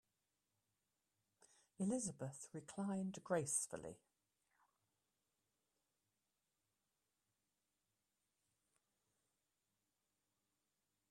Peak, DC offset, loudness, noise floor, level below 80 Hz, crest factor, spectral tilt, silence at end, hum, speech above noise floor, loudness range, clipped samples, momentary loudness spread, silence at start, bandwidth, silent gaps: -26 dBFS; under 0.1%; -45 LUFS; under -90 dBFS; -86 dBFS; 24 dB; -5 dB/octave; 7.15 s; none; over 45 dB; 5 LU; under 0.1%; 13 LU; 1.8 s; 13 kHz; none